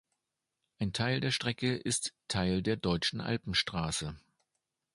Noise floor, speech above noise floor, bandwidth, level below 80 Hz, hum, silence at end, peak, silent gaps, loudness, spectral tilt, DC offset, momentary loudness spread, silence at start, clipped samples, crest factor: -87 dBFS; 54 dB; 11.5 kHz; -54 dBFS; none; 0.75 s; -16 dBFS; none; -32 LUFS; -4 dB/octave; under 0.1%; 5 LU; 0.8 s; under 0.1%; 20 dB